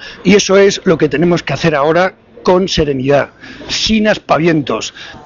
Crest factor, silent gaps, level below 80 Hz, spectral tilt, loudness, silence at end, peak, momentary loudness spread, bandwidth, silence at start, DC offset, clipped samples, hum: 12 dB; none; -36 dBFS; -5 dB/octave; -12 LUFS; 0.05 s; 0 dBFS; 10 LU; 7.6 kHz; 0 s; under 0.1%; under 0.1%; none